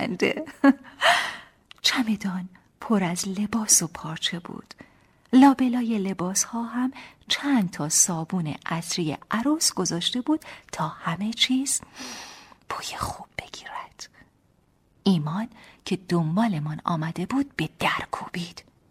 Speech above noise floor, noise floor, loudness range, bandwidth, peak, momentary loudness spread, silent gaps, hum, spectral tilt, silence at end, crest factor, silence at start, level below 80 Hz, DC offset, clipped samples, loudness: 39 dB; -64 dBFS; 8 LU; 16 kHz; -6 dBFS; 17 LU; none; none; -3.5 dB/octave; 0.3 s; 20 dB; 0 s; -58 dBFS; under 0.1%; under 0.1%; -24 LUFS